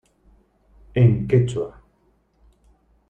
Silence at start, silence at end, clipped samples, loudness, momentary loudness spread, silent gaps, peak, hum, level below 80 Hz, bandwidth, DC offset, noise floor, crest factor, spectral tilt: 0.95 s; 1.4 s; under 0.1%; -20 LUFS; 12 LU; none; -4 dBFS; none; -46 dBFS; 8.8 kHz; under 0.1%; -63 dBFS; 20 dB; -8.5 dB/octave